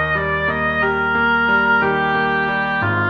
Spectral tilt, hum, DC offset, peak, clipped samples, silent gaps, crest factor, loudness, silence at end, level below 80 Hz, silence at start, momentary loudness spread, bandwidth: -7.5 dB/octave; none; under 0.1%; -6 dBFS; under 0.1%; none; 12 dB; -17 LUFS; 0 s; -40 dBFS; 0 s; 4 LU; 6.6 kHz